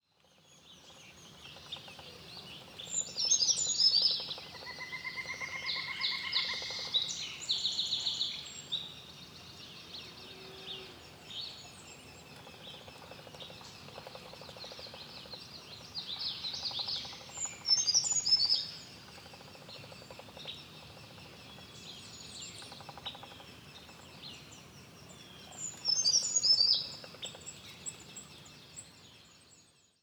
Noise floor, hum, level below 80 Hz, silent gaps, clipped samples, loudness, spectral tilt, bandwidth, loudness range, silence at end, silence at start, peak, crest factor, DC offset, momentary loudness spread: -66 dBFS; none; -72 dBFS; none; under 0.1%; -31 LUFS; 0.5 dB/octave; over 20 kHz; 17 LU; 0.4 s; 0.5 s; -14 dBFS; 24 dB; under 0.1%; 24 LU